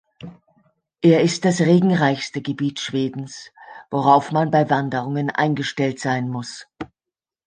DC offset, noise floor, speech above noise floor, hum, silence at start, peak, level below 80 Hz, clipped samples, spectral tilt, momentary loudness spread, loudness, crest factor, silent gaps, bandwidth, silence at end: under 0.1%; -88 dBFS; 69 dB; none; 0.2 s; -2 dBFS; -62 dBFS; under 0.1%; -6 dB/octave; 21 LU; -20 LUFS; 18 dB; none; 9.8 kHz; 0.6 s